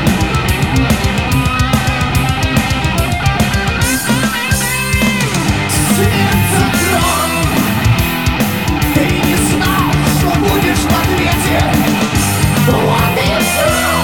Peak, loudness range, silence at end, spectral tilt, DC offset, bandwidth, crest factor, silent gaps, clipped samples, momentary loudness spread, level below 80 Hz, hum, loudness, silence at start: -2 dBFS; 1 LU; 0 s; -4.5 dB/octave; 0.9%; 19.5 kHz; 12 dB; none; under 0.1%; 2 LU; -24 dBFS; none; -13 LUFS; 0 s